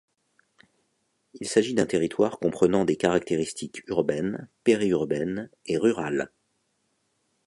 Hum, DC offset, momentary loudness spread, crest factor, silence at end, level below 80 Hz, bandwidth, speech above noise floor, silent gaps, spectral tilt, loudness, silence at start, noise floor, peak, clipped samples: none; under 0.1%; 9 LU; 20 dB; 1.2 s; -60 dBFS; 11.5 kHz; 48 dB; none; -5.5 dB/octave; -26 LUFS; 1.35 s; -73 dBFS; -6 dBFS; under 0.1%